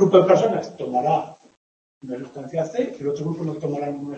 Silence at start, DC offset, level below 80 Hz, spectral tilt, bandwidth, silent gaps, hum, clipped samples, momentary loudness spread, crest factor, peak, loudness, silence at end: 0 s; under 0.1%; -68 dBFS; -7 dB/octave; 8.2 kHz; 1.57-2.01 s; none; under 0.1%; 17 LU; 20 dB; -2 dBFS; -22 LUFS; 0 s